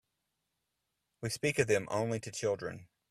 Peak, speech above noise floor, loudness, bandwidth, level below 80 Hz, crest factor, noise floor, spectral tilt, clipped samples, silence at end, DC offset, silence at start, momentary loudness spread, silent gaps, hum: -14 dBFS; 51 dB; -34 LUFS; 15 kHz; -68 dBFS; 24 dB; -84 dBFS; -4.5 dB/octave; under 0.1%; 0.25 s; under 0.1%; 1.2 s; 13 LU; none; none